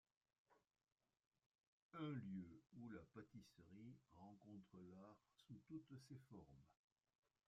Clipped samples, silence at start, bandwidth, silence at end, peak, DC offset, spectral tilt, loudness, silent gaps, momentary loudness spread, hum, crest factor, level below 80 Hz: under 0.1%; 0.5 s; 7.4 kHz; 0.75 s; -40 dBFS; under 0.1%; -7 dB/octave; -60 LUFS; 1.27-1.31 s, 1.46-1.90 s; 13 LU; none; 20 dB; -88 dBFS